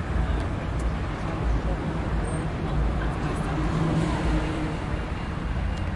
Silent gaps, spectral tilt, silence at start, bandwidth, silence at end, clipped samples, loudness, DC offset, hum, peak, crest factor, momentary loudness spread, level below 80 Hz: none; -7 dB/octave; 0 s; 11 kHz; 0 s; under 0.1%; -28 LUFS; under 0.1%; none; -14 dBFS; 12 dB; 5 LU; -30 dBFS